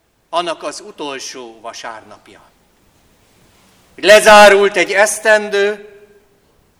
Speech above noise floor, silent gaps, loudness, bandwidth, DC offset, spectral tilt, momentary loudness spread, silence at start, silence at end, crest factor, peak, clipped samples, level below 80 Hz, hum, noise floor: 42 dB; none; -10 LUFS; 18.5 kHz; under 0.1%; -2 dB/octave; 24 LU; 0.3 s; 1 s; 14 dB; 0 dBFS; 0.7%; -48 dBFS; none; -54 dBFS